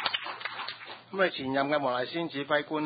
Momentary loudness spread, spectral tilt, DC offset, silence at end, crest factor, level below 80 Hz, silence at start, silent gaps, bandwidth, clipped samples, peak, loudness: 10 LU; -8.5 dB/octave; under 0.1%; 0 s; 22 dB; -72 dBFS; 0 s; none; 5 kHz; under 0.1%; -10 dBFS; -31 LUFS